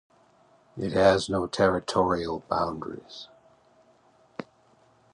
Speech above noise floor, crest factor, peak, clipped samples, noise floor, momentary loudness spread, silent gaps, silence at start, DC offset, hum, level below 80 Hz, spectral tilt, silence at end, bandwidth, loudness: 36 dB; 20 dB; -8 dBFS; under 0.1%; -61 dBFS; 22 LU; none; 0.75 s; under 0.1%; none; -54 dBFS; -5.5 dB/octave; 0.7 s; 11 kHz; -26 LUFS